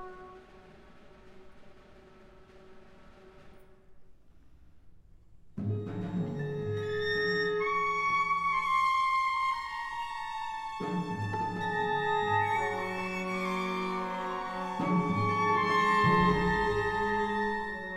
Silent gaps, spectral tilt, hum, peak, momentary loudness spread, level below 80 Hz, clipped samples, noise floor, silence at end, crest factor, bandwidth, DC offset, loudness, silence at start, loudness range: none; -6 dB/octave; none; -14 dBFS; 10 LU; -54 dBFS; under 0.1%; -55 dBFS; 0 s; 18 dB; 14.5 kHz; under 0.1%; -30 LUFS; 0 s; 10 LU